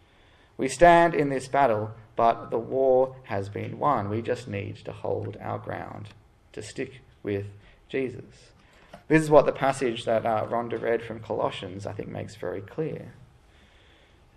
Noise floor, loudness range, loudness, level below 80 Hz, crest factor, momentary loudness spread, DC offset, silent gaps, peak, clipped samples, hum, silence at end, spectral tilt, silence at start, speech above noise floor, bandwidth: -57 dBFS; 12 LU; -26 LUFS; -54 dBFS; 24 dB; 18 LU; under 0.1%; none; -2 dBFS; under 0.1%; none; 1.15 s; -6 dB/octave; 0.6 s; 32 dB; 12.5 kHz